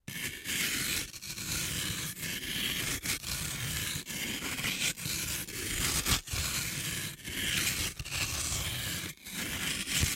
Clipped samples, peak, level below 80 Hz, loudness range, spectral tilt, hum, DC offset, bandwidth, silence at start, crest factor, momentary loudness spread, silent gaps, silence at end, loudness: under 0.1%; -12 dBFS; -48 dBFS; 2 LU; -1.5 dB/octave; none; under 0.1%; 16 kHz; 0.05 s; 22 dB; 6 LU; none; 0 s; -32 LUFS